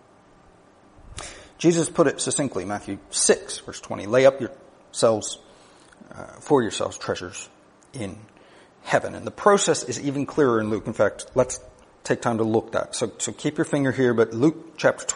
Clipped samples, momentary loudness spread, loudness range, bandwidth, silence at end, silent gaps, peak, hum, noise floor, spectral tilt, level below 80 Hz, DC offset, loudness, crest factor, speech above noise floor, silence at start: under 0.1%; 18 LU; 5 LU; 10.5 kHz; 0 s; none; -2 dBFS; none; -53 dBFS; -4 dB/octave; -56 dBFS; under 0.1%; -23 LUFS; 22 dB; 31 dB; 1.1 s